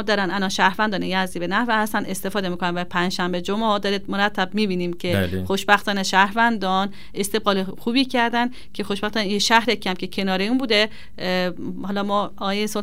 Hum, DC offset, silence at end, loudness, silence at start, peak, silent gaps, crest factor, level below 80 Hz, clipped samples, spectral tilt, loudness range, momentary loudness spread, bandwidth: none; 2%; 0 s; -21 LUFS; 0 s; 0 dBFS; none; 22 dB; -52 dBFS; under 0.1%; -4 dB/octave; 2 LU; 8 LU; 16 kHz